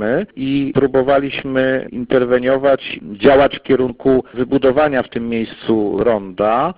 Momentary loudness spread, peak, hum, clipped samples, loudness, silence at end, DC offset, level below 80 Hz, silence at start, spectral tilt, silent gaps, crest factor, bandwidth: 6 LU; 0 dBFS; none; under 0.1%; -16 LUFS; 0.05 s; under 0.1%; -44 dBFS; 0 s; -11 dB/octave; none; 16 dB; 5 kHz